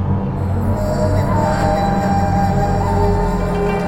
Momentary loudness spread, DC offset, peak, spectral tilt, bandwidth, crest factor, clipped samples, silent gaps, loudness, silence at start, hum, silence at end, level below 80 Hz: 3 LU; under 0.1%; -4 dBFS; -7.5 dB/octave; 15.5 kHz; 12 dB; under 0.1%; none; -17 LUFS; 0 s; none; 0 s; -26 dBFS